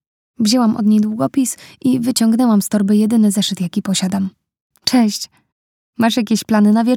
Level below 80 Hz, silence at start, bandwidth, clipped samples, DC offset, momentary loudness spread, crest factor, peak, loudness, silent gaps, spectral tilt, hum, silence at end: -60 dBFS; 0.4 s; 16.5 kHz; under 0.1%; under 0.1%; 8 LU; 16 dB; 0 dBFS; -16 LUFS; 4.61-4.70 s, 5.52-5.93 s; -5 dB/octave; none; 0 s